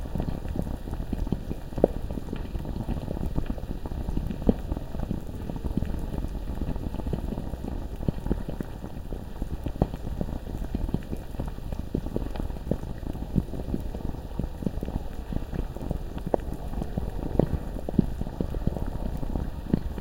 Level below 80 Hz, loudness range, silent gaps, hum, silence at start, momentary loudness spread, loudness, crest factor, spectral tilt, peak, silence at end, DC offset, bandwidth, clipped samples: -34 dBFS; 3 LU; none; none; 0 s; 8 LU; -33 LUFS; 28 dB; -8.5 dB/octave; -2 dBFS; 0 s; under 0.1%; 17 kHz; under 0.1%